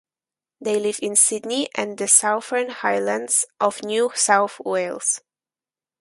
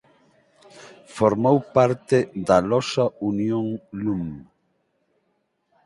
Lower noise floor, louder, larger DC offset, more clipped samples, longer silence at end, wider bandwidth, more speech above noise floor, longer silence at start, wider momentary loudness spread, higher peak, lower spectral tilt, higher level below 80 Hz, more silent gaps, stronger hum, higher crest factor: first, under -90 dBFS vs -71 dBFS; about the same, -20 LUFS vs -22 LUFS; neither; neither; second, 0.8 s vs 1.45 s; about the same, 12 kHz vs 11.5 kHz; first, over 69 dB vs 50 dB; second, 0.6 s vs 0.8 s; about the same, 10 LU vs 11 LU; about the same, 0 dBFS vs -2 dBFS; second, -1 dB/octave vs -6.5 dB/octave; second, -74 dBFS vs -56 dBFS; neither; neither; about the same, 22 dB vs 20 dB